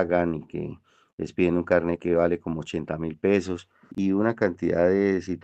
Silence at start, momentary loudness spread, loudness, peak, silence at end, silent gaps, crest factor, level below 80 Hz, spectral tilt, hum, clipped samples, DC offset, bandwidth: 0 s; 13 LU; -25 LUFS; -6 dBFS; 0.05 s; 1.13-1.18 s; 18 dB; -58 dBFS; -7.5 dB/octave; none; under 0.1%; under 0.1%; 8.4 kHz